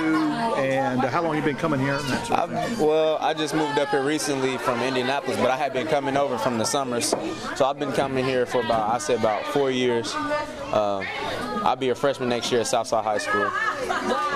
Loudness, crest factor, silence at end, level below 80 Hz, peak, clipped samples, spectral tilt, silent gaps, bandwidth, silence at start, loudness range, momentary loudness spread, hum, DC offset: -24 LUFS; 16 dB; 0 s; -54 dBFS; -8 dBFS; under 0.1%; -4 dB/octave; none; 15.5 kHz; 0 s; 1 LU; 3 LU; none; under 0.1%